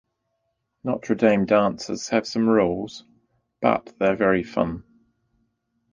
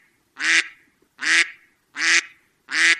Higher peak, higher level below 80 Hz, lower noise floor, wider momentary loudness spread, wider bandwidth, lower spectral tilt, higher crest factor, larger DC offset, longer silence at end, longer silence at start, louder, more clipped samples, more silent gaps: about the same, -2 dBFS vs 0 dBFS; first, -54 dBFS vs -78 dBFS; first, -75 dBFS vs -54 dBFS; about the same, 12 LU vs 10 LU; second, 9.6 kHz vs 12.5 kHz; first, -6 dB/octave vs 3 dB/octave; about the same, 22 dB vs 22 dB; neither; first, 1.1 s vs 0 s; first, 0.85 s vs 0.4 s; second, -22 LUFS vs -19 LUFS; neither; neither